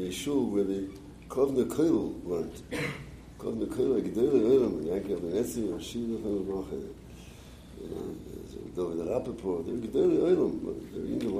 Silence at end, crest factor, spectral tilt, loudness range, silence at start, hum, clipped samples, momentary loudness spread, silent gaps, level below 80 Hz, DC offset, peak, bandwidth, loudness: 0 s; 18 dB; -6.5 dB/octave; 8 LU; 0 s; none; under 0.1%; 18 LU; none; -52 dBFS; under 0.1%; -12 dBFS; 15.5 kHz; -30 LUFS